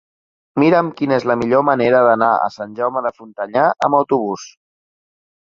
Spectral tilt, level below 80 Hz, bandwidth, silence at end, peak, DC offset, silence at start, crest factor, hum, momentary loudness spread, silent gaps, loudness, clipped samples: -6.5 dB/octave; -60 dBFS; 7.4 kHz; 0.95 s; -2 dBFS; under 0.1%; 0.55 s; 16 dB; none; 12 LU; none; -16 LUFS; under 0.1%